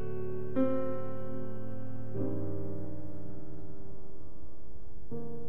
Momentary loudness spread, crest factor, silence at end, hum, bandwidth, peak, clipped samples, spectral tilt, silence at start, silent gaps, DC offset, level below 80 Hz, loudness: 20 LU; 20 dB; 0 s; none; 13 kHz; -18 dBFS; under 0.1%; -10 dB/octave; 0 s; none; 4%; -56 dBFS; -39 LUFS